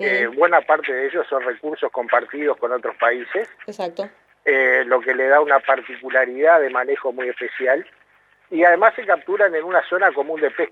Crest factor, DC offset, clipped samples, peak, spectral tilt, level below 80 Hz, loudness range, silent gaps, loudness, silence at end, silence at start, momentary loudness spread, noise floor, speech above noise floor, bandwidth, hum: 18 dB; under 0.1%; under 0.1%; 0 dBFS; -5 dB/octave; -78 dBFS; 5 LU; none; -19 LUFS; 0.05 s; 0 s; 11 LU; -57 dBFS; 38 dB; 7.2 kHz; none